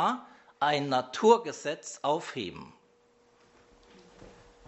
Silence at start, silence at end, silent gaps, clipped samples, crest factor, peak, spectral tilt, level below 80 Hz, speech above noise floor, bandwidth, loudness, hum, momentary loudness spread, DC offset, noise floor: 0 s; 0.4 s; none; under 0.1%; 24 dB; -8 dBFS; -4 dB/octave; -70 dBFS; 36 dB; 8.2 kHz; -29 LUFS; none; 15 LU; under 0.1%; -65 dBFS